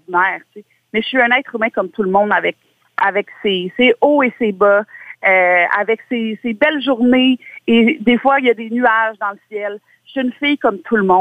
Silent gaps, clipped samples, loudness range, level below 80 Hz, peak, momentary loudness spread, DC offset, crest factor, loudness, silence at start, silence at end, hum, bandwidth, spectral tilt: none; under 0.1%; 3 LU; -58 dBFS; -2 dBFS; 11 LU; under 0.1%; 14 dB; -15 LUFS; 0.1 s; 0 s; none; 4.8 kHz; -7 dB/octave